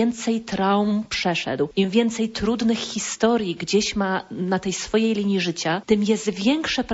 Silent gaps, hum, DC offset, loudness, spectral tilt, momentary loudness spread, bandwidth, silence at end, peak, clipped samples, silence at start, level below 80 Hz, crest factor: none; none; under 0.1%; -22 LUFS; -4.5 dB/octave; 4 LU; 8 kHz; 0 s; -6 dBFS; under 0.1%; 0 s; -50 dBFS; 16 dB